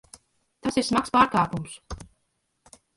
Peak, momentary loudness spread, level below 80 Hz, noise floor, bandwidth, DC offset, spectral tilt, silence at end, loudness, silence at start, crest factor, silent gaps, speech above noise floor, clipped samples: -4 dBFS; 20 LU; -50 dBFS; -74 dBFS; 11.5 kHz; under 0.1%; -4.5 dB/octave; 0.95 s; -24 LUFS; 0.65 s; 22 dB; none; 51 dB; under 0.1%